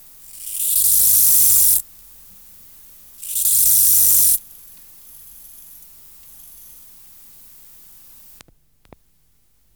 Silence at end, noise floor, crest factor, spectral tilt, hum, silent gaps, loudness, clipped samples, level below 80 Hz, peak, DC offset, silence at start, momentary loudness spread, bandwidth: 5.35 s; -62 dBFS; 14 dB; 1.5 dB/octave; none; none; -12 LUFS; under 0.1%; -52 dBFS; -6 dBFS; 0.1%; 0.35 s; 14 LU; over 20 kHz